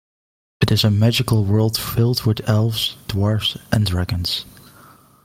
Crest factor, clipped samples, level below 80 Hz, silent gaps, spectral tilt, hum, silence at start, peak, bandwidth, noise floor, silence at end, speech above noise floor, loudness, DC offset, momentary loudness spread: 16 dB; under 0.1%; -44 dBFS; none; -5.5 dB/octave; none; 0.6 s; -2 dBFS; 16.5 kHz; -48 dBFS; 0.75 s; 30 dB; -19 LUFS; under 0.1%; 6 LU